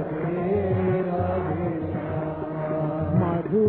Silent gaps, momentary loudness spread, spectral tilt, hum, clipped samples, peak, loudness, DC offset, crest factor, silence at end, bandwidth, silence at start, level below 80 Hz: none; 6 LU; -13 dB/octave; none; under 0.1%; -10 dBFS; -26 LUFS; under 0.1%; 14 dB; 0 s; 4.3 kHz; 0 s; -50 dBFS